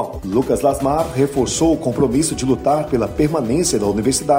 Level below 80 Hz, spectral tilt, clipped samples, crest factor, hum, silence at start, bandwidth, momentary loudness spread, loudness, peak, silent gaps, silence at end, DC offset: -36 dBFS; -5 dB/octave; under 0.1%; 14 dB; none; 0 s; 16 kHz; 2 LU; -18 LUFS; -4 dBFS; none; 0 s; under 0.1%